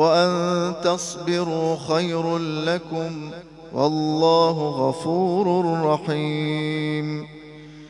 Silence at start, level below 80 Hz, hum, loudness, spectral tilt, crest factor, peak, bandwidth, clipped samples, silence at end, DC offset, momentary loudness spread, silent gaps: 0 s; -60 dBFS; none; -22 LUFS; -5.5 dB/octave; 16 dB; -6 dBFS; 11.5 kHz; under 0.1%; 0 s; under 0.1%; 13 LU; none